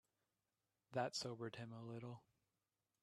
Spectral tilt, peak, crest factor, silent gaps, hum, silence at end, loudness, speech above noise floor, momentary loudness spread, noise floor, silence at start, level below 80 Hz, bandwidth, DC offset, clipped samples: -4.5 dB/octave; -28 dBFS; 24 dB; none; none; 0.85 s; -49 LUFS; over 42 dB; 11 LU; under -90 dBFS; 0.9 s; -88 dBFS; 13 kHz; under 0.1%; under 0.1%